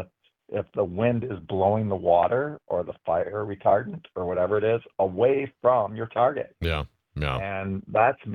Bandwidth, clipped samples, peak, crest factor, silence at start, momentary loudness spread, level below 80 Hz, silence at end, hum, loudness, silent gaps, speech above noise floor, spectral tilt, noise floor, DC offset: 9.6 kHz; under 0.1%; -6 dBFS; 18 dB; 0 s; 9 LU; -48 dBFS; 0 s; none; -25 LUFS; none; 21 dB; -8.5 dB/octave; -46 dBFS; under 0.1%